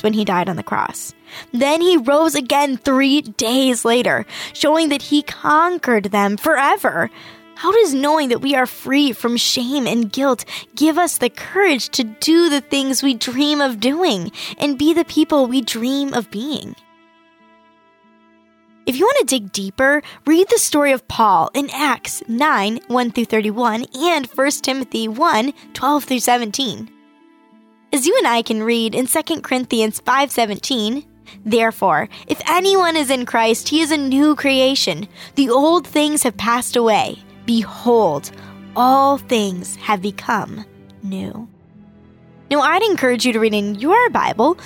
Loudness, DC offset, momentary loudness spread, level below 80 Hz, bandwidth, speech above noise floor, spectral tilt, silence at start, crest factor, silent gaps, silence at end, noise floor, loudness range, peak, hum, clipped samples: -17 LUFS; under 0.1%; 9 LU; -58 dBFS; 19 kHz; 36 dB; -3 dB/octave; 0.05 s; 14 dB; none; 0 s; -53 dBFS; 4 LU; -4 dBFS; none; under 0.1%